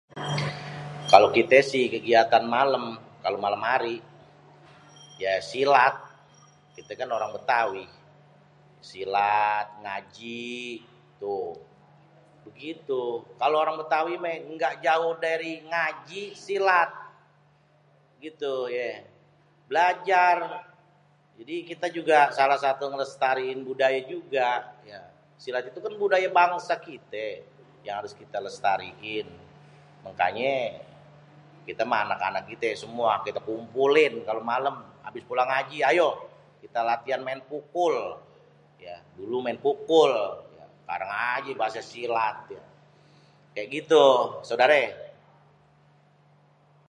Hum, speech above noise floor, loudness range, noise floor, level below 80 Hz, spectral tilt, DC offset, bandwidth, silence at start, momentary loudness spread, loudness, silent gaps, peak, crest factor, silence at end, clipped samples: none; 36 dB; 7 LU; -61 dBFS; -72 dBFS; -4.5 dB/octave; under 0.1%; 11 kHz; 0.15 s; 19 LU; -25 LUFS; none; 0 dBFS; 26 dB; 1.8 s; under 0.1%